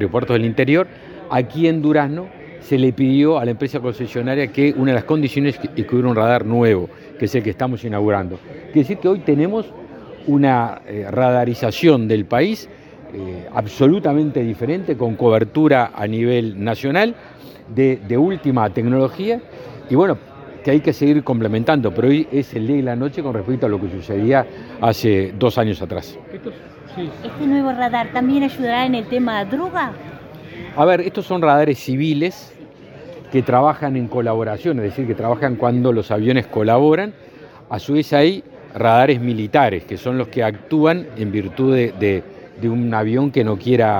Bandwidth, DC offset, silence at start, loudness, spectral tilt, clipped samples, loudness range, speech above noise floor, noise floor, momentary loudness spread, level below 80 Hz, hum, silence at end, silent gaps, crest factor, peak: 18 kHz; under 0.1%; 0 s; -18 LUFS; -8 dB/octave; under 0.1%; 3 LU; 22 dB; -39 dBFS; 13 LU; -54 dBFS; none; 0 s; none; 18 dB; 0 dBFS